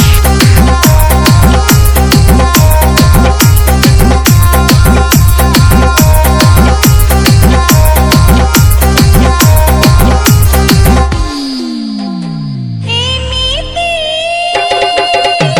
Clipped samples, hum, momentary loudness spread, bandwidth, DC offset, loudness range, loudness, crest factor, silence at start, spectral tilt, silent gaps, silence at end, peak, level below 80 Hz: 6%; none; 7 LU; over 20 kHz; under 0.1%; 5 LU; -7 LUFS; 6 dB; 0 s; -5 dB/octave; none; 0 s; 0 dBFS; -10 dBFS